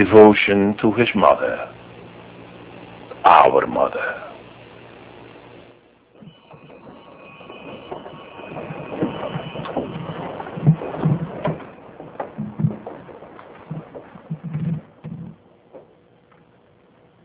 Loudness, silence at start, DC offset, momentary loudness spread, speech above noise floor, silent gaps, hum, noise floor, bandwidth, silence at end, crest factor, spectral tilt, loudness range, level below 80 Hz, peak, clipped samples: -19 LUFS; 0 s; under 0.1%; 26 LU; 40 dB; none; none; -54 dBFS; 4 kHz; 1.45 s; 22 dB; -11 dB/octave; 21 LU; -52 dBFS; 0 dBFS; under 0.1%